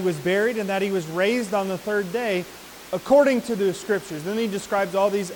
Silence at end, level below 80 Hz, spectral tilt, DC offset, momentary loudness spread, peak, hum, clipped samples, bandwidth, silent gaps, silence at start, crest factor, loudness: 0 s; -60 dBFS; -5 dB/octave; under 0.1%; 10 LU; -6 dBFS; none; under 0.1%; 19 kHz; none; 0 s; 16 dB; -23 LUFS